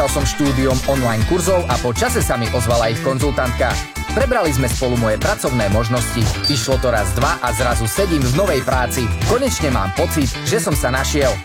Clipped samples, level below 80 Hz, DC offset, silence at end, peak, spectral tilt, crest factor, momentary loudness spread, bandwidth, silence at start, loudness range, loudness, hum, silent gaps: under 0.1%; -26 dBFS; under 0.1%; 0 s; -2 dBFS; -4.5 dB/octave; 14 dB; 2 LU; 17 kHz; 0 s; 1 LU; -17 LUFS; none; none